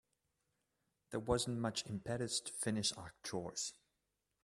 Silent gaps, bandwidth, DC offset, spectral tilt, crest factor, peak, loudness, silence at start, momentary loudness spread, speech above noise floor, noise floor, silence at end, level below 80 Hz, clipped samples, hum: none; 14 kHz; under 0.1%; -3.5 dB/octave; 22 dB; -20 dBFS; -40 LUFS; 1.1 s; 8 LU; 46 dB; -87 dBFS; 0.7 s; -64 dBFS; under 0.1%; none